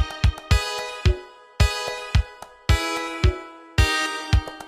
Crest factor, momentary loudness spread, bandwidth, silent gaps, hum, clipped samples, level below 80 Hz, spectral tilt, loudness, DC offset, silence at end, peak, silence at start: 18 dB; 9 LU; 15 kHz; none; none; under 0.1%; -26 dBFS; -4.5 dB/octave; -24 LUFS; under 0.1%; 0 s; -4 dBFS; 0 s